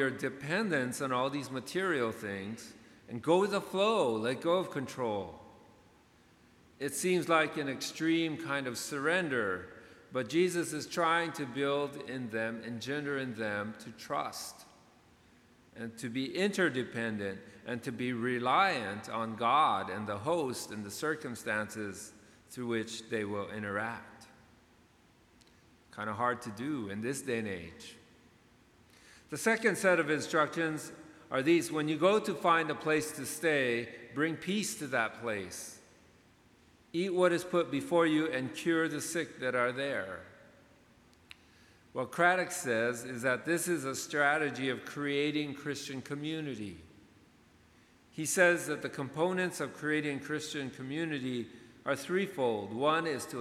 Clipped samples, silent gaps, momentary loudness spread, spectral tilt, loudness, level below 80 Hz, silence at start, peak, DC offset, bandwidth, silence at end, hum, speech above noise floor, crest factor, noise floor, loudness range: under 0.1%; none; 13 LU; -4 dB/octave; -33 LUFS; -74 dBFS; 0 s; -12 dBFS; under 0.1%; 16 kHz; 0 s; none; 31 dB; 22 dB; -64 dBFS; 7 LU